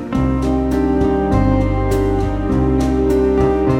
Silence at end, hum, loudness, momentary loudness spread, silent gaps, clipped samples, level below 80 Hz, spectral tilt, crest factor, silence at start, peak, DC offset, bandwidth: 0 s; none; -16 LUFS; 3 LU; none; under 0.1%; -22 dBFS; -8.5 dB/octave; 12 dB; 0 s; -2 dBFS; under 0.1%; 16 kHz